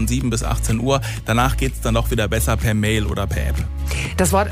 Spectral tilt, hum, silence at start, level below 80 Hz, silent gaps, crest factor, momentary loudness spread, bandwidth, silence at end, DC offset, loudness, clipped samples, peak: -5 dB/octave; none; 0 s; -24 dBFS; none; 16 dB; 5 LU; 16 kHz; 0 s; under 0.1%; -20 LUFS; under 0.1%; -4 dBFS